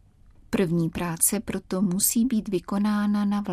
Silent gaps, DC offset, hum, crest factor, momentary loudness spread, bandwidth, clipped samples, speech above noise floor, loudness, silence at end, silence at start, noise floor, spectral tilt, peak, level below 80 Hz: none; under 0.1%; none; 20 dB; 7 LU; 15.5 kHz; under 0.1%; 29 dB; -24 LUFS; 0 s; 0.5 s; -53 dBFS; -4.5 dB/octave; -6 dBFS; -50 dBFS